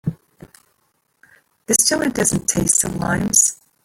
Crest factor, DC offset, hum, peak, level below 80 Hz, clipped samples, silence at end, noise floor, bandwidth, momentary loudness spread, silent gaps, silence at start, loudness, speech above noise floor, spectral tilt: 20 dB; under 0.1%; none; 0 dBFS; -46 dBFS; under 0.1%; 0.3 s; -66 dBFS; 17 kHz; 6 LU; none; 0.05 s; -16 LUFS; 48 dB; -3 dB/octave